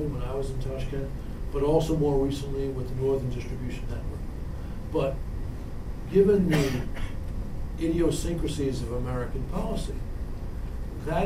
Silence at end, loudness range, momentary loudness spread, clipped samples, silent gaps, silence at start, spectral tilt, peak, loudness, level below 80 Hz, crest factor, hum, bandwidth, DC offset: 0 s; 5 LU; 13 LU; under 0.1%; none; 0 s; -7 dB/octave; -10 dBFS; -29 LUFS; -34 dBFS; 18 dB; none; 15.5 kHz; 0.3%